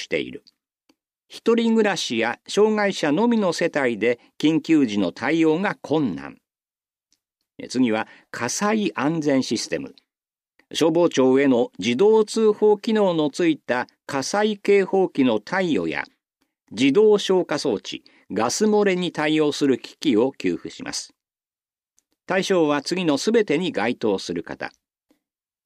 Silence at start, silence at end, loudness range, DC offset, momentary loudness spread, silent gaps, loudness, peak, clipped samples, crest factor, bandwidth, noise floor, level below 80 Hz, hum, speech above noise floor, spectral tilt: 0 s; 0.95 s; 5 LU; under 0.1%; 12 LU; none; -21 LUFS; -6 dBFS; under 0.1%; 16 dB; 13.5 kHz; under -90 dBFS; -68 dBFS; none; over 69 dB; -4.5 dB/octave